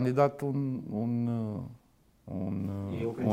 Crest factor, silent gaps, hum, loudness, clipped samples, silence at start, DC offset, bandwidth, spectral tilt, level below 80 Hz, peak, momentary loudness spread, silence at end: 20 dB; none; none; -33 LUFS; under 0.1%; 0 s; under 0.1%; 15.5 kHz; -9.5 dB/octave; -64 dBFS; -12 dBFS; 11 LU; 0 s